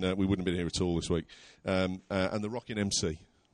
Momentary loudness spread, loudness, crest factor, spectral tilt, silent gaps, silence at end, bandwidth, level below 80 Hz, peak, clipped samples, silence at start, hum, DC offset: 7 LU; -32 LUFS; 16 dB; -5 dB/octave; none; 0.3 s; 11.5 kHz; -52 dBFS; -16 dBFS; under 0.1%; 0 s; none; under 0.1%